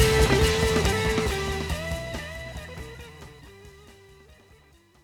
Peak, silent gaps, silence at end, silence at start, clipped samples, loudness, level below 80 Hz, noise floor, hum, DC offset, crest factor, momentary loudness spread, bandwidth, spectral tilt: -6 dBFS; none; 1.15 s; 0 s; under 0.1%; -25 LUFS; -34 dBFS; -57 dBFS; none; under 0.1%; 20 dB; 22 LU; 19.5 kHz; -4.5 dB/octave